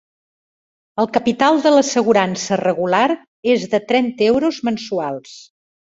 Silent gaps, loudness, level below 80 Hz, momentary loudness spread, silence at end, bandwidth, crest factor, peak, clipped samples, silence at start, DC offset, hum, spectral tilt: 3.28-3.43 s; -17 LUFS; -58 dBFS; 9 LU; 0.5 s; 8 kHz; 16 dB; -2 dBFS; under 0.1%; 0.95 s; under 0.1%; none; -4.5 dB/octave